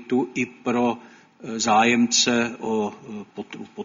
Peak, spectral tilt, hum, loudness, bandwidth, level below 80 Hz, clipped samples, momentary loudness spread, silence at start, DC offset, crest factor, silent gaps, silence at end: -6 dBFS; -2.5 dB/octave; none; -21 LUFS; 7.6 kHz; -64 dBFS; under 0.1%; 19 LU; 0 s; under 0.1%; 18 dB; none; 0 s